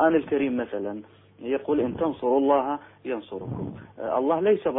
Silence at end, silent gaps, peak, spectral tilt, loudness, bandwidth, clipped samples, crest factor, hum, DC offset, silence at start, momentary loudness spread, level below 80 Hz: 0 s; none; -8 dBFS; -11 dB/octave; -26 LUFS; 3.9 kHz; under 0.1%; 18 dB; none; under 0.1%; 0 s; 13 LU; -58 dBFS